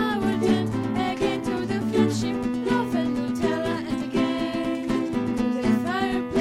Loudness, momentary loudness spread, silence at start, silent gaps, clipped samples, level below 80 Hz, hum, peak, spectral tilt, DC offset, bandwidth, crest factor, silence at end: -25 LUFS; 4 LU; 0 s; none; under 0.1%; -48 dBFS; none; -8 dBFS; -6 dB/octave; under 0.1%; 14 kHz; 16 dB; 0 s